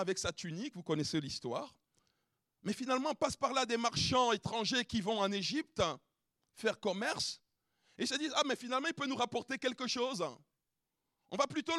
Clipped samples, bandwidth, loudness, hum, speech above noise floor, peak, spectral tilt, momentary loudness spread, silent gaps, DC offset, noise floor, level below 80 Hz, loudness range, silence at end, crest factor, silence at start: under 0.1%; 13.5 kHz; -36 LUFS; none; 52 dB; -18 dBFS; -3.5 dB/octave; 9 LU; none; under 0.1%; -88 dBFS; -66 dBFS; 4 LU; 0 s; 20 dB; 0 s